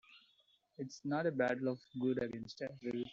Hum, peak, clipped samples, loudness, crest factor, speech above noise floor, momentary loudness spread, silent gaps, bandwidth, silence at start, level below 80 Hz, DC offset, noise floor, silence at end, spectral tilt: none; -20 dBFS; under 0.1%; -39 LUFS; 18 dB; 35 dB; 11 LU; none; 7.6 kHz; 0.1 s; -76 dBFS; under 0.1%; -74 dBFS; 0 s; -5.5 dB/octave